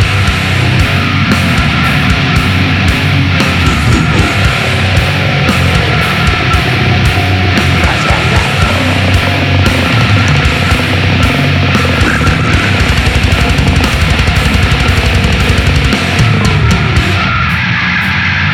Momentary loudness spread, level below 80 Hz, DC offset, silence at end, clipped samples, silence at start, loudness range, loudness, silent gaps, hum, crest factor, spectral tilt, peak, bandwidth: 1 LU; -18 dBFS; under 0.1%; 0 s; under 0.1%; 0 s; 0 LU; -9 LUFS; none; none; 10 dB; -5 dB/octave; 0 dBFS; 17 kHz